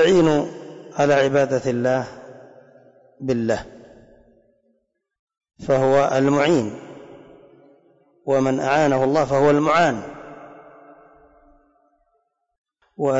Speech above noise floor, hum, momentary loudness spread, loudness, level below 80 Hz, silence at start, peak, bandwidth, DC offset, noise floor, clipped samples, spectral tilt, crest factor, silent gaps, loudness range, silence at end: 52 dB; none; 21 LU; -19 LUFS; -56 dBFS; 0 s; -8 dBFS; 8 kHz; under 0.1%; -70 dBFS; under 0.1%; -6 dB/octave; 14 dB; 5.19-5.27 s, 12.58-12.64 s; 10 LU; 0 s